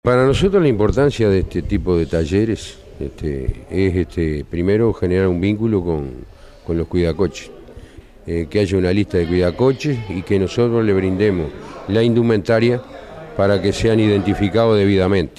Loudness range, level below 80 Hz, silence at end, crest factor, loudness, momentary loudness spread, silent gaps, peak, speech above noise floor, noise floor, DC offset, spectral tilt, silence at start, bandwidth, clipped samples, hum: 4 LU; -34 dBFS; 0.1 s; 12 dB; -17 LUFS; 12 LU; none; -4 dBFS; 23 dB; -39 dBFS; under 0.1%; -7.5 dB/octave; 0.05 s; 11.5 kHz; under 0.1%; none